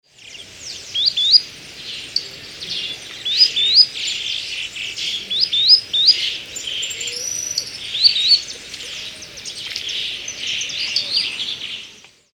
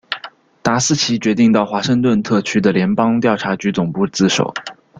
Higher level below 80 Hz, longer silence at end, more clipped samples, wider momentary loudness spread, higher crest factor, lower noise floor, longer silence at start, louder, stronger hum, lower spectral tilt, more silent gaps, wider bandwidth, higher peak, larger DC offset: second, -58 dBFS vs -52 dBFS; about the same, 0.35 s vs 0.25 s; neither; first, 19 LU vs 7 LU; first, 20 dB vs 14 dB; first, -43 dBFS vs -37 dBFS; about the same, 0.2 s vs 0.1 s; about the same, -16 LUFS vs -16 LUFS; neither; second, 1.5 dB/octave vs -4.5 dB/octave; neither; first, 19 kHz vs 9.2 kHz; about the same, 0 dBFS vs -2 dBFS; neither